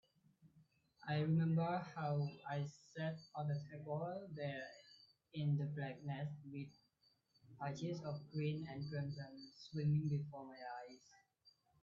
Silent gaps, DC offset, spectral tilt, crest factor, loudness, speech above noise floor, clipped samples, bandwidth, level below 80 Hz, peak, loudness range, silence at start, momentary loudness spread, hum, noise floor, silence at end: none; under 0.1%; -7 dB/octave; 16 dB; -44 LUFS; 36 dB; under 0.1%; 7.4 kHz; -78 dBFS; -28 dBFS; 5 LU; 0.45 s; 15 LU; none; -79 dBFS; 0.3 s